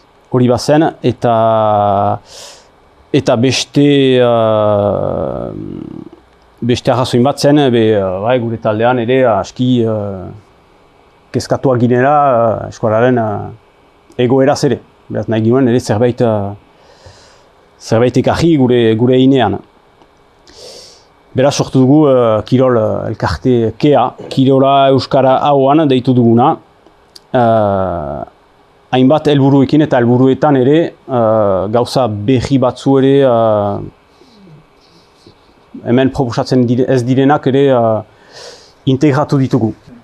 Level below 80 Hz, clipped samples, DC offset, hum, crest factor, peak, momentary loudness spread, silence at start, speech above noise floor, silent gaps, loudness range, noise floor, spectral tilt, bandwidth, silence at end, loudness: -44 dBFS; under 0.1%; under 0.1%; none; 12 dB; 0 dBFS; 12 LU; 0.3 s; 36 dB; none; 4 LU; -47 dBFS; -7 dB/octave; 12 kHz; 0.3 s; -12 LUFS